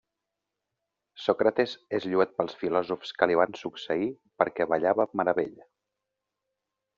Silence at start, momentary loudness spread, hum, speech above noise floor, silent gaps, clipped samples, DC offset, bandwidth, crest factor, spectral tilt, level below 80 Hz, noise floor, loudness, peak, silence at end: 1.15 s; 8 LU; none; 59 dB; none; under 0.1%; under 0.1%; 7.4 kHz; 24 dB; -3.5 dB/octave; -72 dBFS; -86 dBFS; -28 LUFS; -6 dBFS; 1.45 s